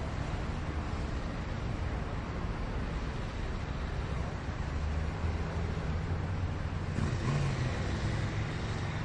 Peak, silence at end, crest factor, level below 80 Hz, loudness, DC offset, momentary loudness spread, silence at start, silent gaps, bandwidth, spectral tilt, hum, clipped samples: -20 dBFS; 0 s; 14 dB; -40 dBFS; -36 LUFS; under 0.1%; 5 LU; 0 s; none; 9.8 kHz; -6.5 dB/octave; none; under 0.1%